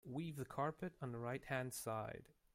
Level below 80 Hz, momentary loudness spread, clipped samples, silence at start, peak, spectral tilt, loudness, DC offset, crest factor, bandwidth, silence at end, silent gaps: -74 dBFS; 5 LU; under 0.1%; 0.05 s; -26 dBFS; -5.5 dB/octave; -46 LUFS; under 0.1%; 20 dB; 16.5 kHz; 0.25 s; none